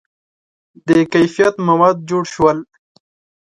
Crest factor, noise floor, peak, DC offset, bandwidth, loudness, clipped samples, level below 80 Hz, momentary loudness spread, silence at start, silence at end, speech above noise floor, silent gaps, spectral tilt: 16 dB; under -90 dBFS; 0 dBFS; under 0.1%; 11 kHz; -15 LUFS; under 0.1%; -52 dBFS; 8 LU; 0.85 s; 0.8 s; over 76 dB; none; -6.5 dB/octave